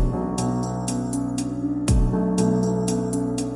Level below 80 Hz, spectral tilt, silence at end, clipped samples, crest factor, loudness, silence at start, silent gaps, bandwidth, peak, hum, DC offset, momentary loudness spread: -30 dBFS; -6.5 dB/octave; 0 s; under 0.1%; 14 dB; -24 LUFS; 0 s; none; 11.5 kHz; -8 dBFS; none; under 0.1%; 5 LU